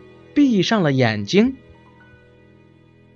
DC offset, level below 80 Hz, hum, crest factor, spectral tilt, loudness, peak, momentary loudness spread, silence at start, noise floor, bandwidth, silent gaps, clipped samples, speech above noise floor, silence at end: under 0.1%; -54 dBFS; none; 18 dB; -6 dB/octave; -18 LUFS; -2 dBFS; 7 LU; 0.35 s; -51 dBFS; 7.6 kHz; none; under 0.1%; 34 dB; 1.6 s